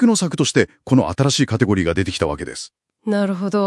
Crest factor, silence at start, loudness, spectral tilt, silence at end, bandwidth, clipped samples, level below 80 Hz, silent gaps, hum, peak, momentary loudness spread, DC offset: 18 dB; 0 s; -18 LUFS; -5 dB/octave; 0 s; 12 kHz; under 0.1%; -46 dBFS; none; none; 0 dBFS; 13 LU; under 0.1%